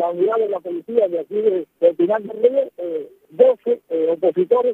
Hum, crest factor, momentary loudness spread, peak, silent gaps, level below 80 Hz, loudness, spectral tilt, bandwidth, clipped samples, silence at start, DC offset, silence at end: none; 18 dB; 10 LU; -2 dBFS; none; -74 dBFS; -19 LUFS; -8.5 dB/octave; 3.9 kHz; under 0.1%; 0 s; under 0.1%; 0 s